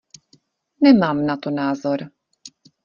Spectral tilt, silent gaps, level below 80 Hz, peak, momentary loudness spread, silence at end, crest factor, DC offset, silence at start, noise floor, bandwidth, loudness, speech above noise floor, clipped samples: -6.5 dB/octave; none; -60 dBFS; -2 dBFS; 12 LU; 0.35 s; 18 dB; under 0.1%; 0.8 s; -59 dBFS; 7.2 kHz; -19 LUFS; 42 dB; under 0.1%